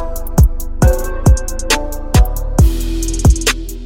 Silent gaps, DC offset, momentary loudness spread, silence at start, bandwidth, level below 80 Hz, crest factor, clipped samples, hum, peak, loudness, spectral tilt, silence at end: none; under 0.1%; 4 LU; 0 s; 17 kHz; -14 dBFS; 12 dB; under 0.1%; none; 0 dBFS; -15 LUFS; -5 dB/octave; 0 s